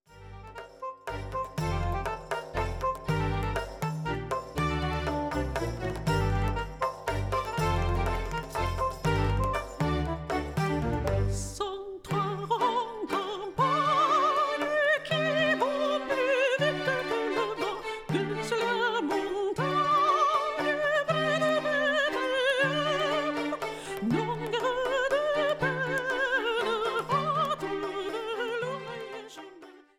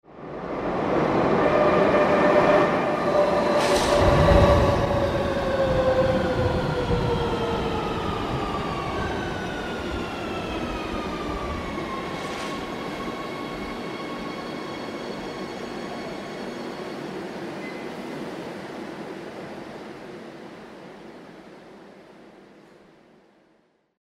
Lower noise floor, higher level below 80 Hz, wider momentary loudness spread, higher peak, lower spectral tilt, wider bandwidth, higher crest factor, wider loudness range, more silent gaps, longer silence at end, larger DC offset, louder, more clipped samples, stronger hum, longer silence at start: second, -51 dBFS vs -64 dBFS; about the same, -42 dBFS vs -38 dBFS; second, 9 LU vs 18 LU; second, -14 dBFS vs -4 dBFS; about the same, -5.5 dB/octave vs -6 dB/octave; about the same, 16.5 kHz vs 15 kHz; about the same, 16 dB vs 20 dB; second, 5 LU vs 18 LU; neither; second, 0.2 s vs 1.6 s; neither; second, -29 LUFS vs -24 LUFS; neither; neither; about the same, 0.1 s vs 0.1 s